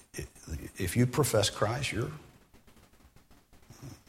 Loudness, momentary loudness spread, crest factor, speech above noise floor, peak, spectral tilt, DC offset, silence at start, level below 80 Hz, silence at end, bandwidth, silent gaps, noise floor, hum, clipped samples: -31 LUFS; 21 LU; 22 dB; 30 dB; -12 dBFS; -4.5 dB/octave; under 0.1%; 0.15 s; -52 dBFS; 0.1 s; 16.5 kHz; none; -59 dBFS; none; under 0.1%